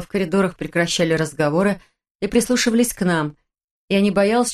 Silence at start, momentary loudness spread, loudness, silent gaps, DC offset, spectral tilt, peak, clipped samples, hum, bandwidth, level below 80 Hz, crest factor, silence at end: 0 s; 6 LU; -19 LUFS; 2.11-2.19 s, 3.64-3.88 s; under 0.1%; -4.5 dB/octave; -4 dBFS; under 0.1%; none; 13 kHz; -48 dBFS; 16 dB; 0 s